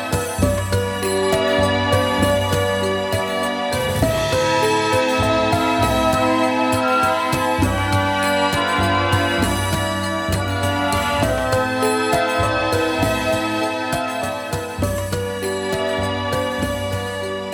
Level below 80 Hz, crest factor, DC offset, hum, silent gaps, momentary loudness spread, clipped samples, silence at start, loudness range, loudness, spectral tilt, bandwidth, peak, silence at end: -36 dBFS; 16 dB; under 0.1%; none; none; 6 LU; under 0.1%; 0 s; 4 LU; -19 LUFS; -4.5 dB/octave; 19 kHz; -4 dBFS; 0 s